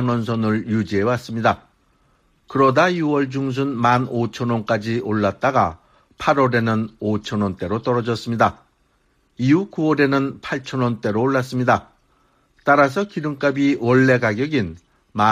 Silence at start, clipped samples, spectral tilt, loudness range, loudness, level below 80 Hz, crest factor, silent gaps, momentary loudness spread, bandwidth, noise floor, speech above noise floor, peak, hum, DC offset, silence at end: 0 s; under 0.1%; -7 dB/octave; 2 LU; -20 LUFS; -54 dBFS; 16 dB; none; 8 LU; 13 kHz; -63 dBFS; 44 dB; -4 dBFS; none; under 0.1%; 0 s